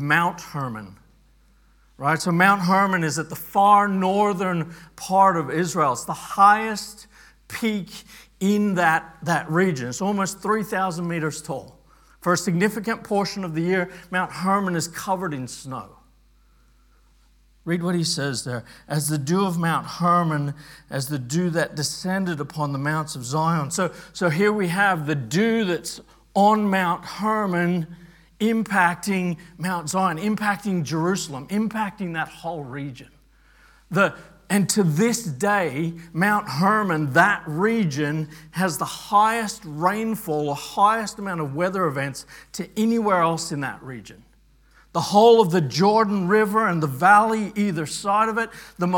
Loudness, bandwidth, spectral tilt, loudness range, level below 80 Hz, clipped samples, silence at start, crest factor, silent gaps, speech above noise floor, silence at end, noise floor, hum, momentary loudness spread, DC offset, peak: -22 LUFS; 18 kHz; -5 dB/octave; 6 LU; -58 dBFS; under 0.1%; 0 s; 22 dB; none; 35 dB; 0 s; -57 dBFS; none; 13 LU; under 0.1%; 0 dBFS